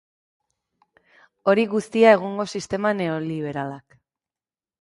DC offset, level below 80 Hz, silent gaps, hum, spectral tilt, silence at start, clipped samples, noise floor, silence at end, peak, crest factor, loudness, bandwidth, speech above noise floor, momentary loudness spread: under 0.1%; -64 dBFS; none; none; -6 dB/octave; 1.45 s; under 0.1%; under -90 dBFS; 1 s; -2 dBFS; 22 dB; -21 LUFS; 11.5 kHz; over 69 dB; 14 LU